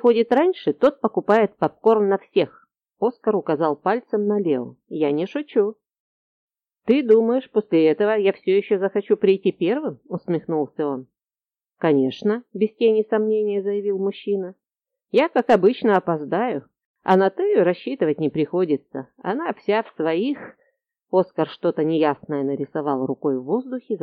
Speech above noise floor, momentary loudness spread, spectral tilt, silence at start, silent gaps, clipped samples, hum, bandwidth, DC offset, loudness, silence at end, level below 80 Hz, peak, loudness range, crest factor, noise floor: over 70 dB; 8 LU; -8.5 dB/octave; 0.05 s; 6.00-6.48 s, 16.85-16.95 s; under 0.1%; none; 6.2 kHz; under 0.1%; -21 LUFS; 0.05 s; -70 dBFS; -4 dBFS; 4 LU; 16 dB; under -90 dBFS